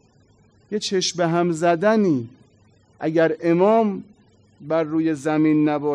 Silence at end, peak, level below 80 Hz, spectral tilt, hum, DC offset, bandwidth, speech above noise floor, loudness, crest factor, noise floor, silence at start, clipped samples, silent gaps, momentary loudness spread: 0 s; -6 dBFS; -68 dBFS; -5.5 dB/octave; none; under 0.1%; 10.5 kHz; 37 dB; -20 LUFS; 14 dB; -56 dBFS; 0.7 s; under 0.1%; none; 9 LU